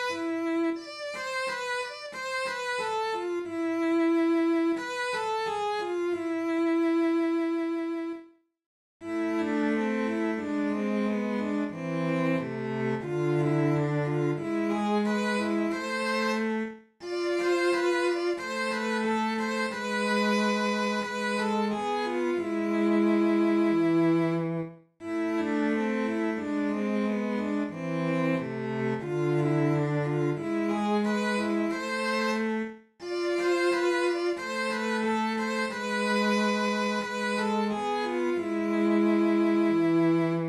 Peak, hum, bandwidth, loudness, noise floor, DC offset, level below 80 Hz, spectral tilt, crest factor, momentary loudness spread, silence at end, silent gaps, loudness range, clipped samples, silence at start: -14 dBFS; none; 12.5 kHz; -28 LUFS; -51 dBFS; under 0.1%; -70 dBFS; -6 dB/octave; 12 dB; 7 LU; 0 s; 8.66-9.00 s; 3 LU; under 0.1%; 0 s